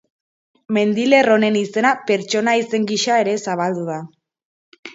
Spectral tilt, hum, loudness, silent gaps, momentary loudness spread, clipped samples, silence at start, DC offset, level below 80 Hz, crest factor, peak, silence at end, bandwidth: -4.5 dB/octave; none; -17 LUFS; 4.45-4.72 s, 4.79-4.83 s; 9 LU; under 0.1%; 0.7 s; under 0.1%; -70 dBFS; 18 dB; 0 dBFS; 0 s; 8 kHz